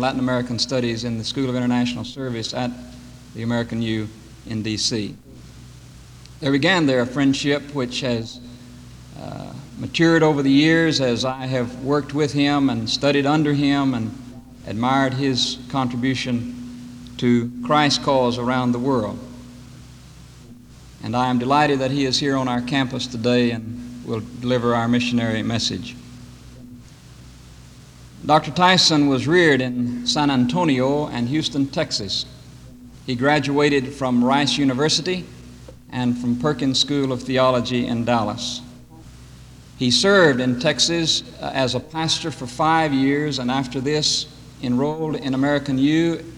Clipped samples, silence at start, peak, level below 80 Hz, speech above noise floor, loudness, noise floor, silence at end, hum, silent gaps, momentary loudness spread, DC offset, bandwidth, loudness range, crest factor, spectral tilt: under 0.1%; 0 s; -4 dBFS; -48 dBFS; 23 dB; -20 LUFS; -43 dBFS; 0 s; none; none; 16 LU; under 0.1%; 12 kHz; 6 LU; 18 dB; -4.5 dB/octave